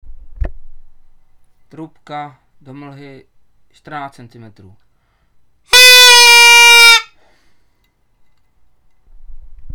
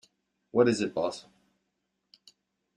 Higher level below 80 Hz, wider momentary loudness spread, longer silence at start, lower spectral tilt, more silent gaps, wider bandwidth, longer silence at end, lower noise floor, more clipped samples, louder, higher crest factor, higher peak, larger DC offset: first, -34 dBFS vs -70 dBFS; first, 27 LU vs 10 LU; second, 0.1 s vs 0.55 s; second, 1 dB/octave vs -5.5 dB/octave; neither; first, over 20 kHz vs 10.5 kHz; second, 0.05 s vs 1.55 s; second, -57 dBFS vs -81 dBFS; first, 0.8% vs under 0.1%; first, -3 LUFS vs -28 LUFS; second, 14 dB vs 22 dB; first, 0 dBFS vs -10 dBFS; neither